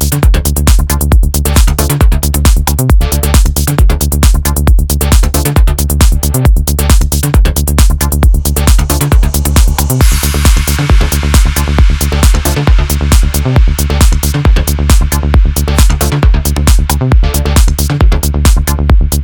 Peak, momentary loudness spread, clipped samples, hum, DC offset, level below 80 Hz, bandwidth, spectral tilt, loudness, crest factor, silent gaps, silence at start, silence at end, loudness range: 0 dBFS; 1 LU; 0.5%; none; under 0.1%; -8 dBFS; over 20 kHz; -5 dB/octave; -10 LUFS; 8 dB; none; 0 s; 0 s; 0 LU